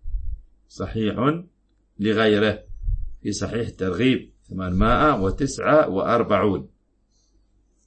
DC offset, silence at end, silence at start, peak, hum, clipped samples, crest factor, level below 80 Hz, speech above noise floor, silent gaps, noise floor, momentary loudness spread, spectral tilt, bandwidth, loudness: under 0.1%; 1.2 s; 0 s; -6 dBFS; none; under 0.1%; 18 dB; -34 dBFS; 43 dB; none; -64 dBFS; 14 LU; -6 dB/octave; 8.8 kHz; -22 LUFS